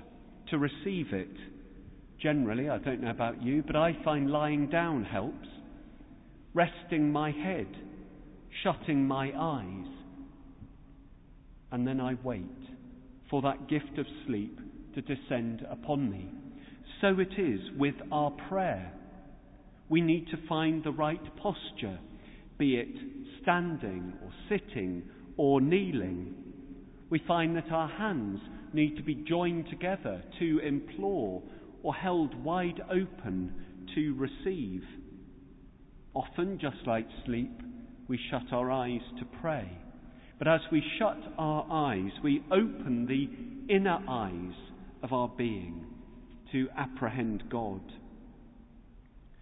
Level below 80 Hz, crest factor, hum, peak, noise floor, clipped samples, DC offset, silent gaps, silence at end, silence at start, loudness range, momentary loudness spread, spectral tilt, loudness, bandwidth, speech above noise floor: -54 dBFS; 20 dB; none; -14 dBFS; -55 dBFS; under 0.1%; under 0.1%; none; 0 s; 0 s; 6 LU; 20 LU; -4 dB/octave; -33 LUFS; 3.9 kHz; 23 dB